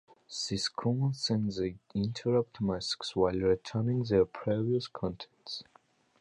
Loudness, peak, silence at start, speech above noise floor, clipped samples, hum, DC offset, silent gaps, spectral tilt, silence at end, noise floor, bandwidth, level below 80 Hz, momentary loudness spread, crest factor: -32 LUFS; -14 dBFS; 0.3 s; 34 dB; under 0.1%; none; under 0.1%; none; -6 dB/octave; 0.6 s; -65 dBFS; 11.5 kHz; -56 dBFS; 11 LU; 18 dB